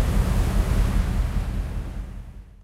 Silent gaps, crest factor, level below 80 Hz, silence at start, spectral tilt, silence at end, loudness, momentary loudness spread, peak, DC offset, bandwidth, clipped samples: none; 14 dB; -24 dBFS; 0 s; -6.5 dB/octave; 0.15 s; -26 LUFS; 15 LU; -10 dBFS; under 0.1%; 15 kHz; under 0.1%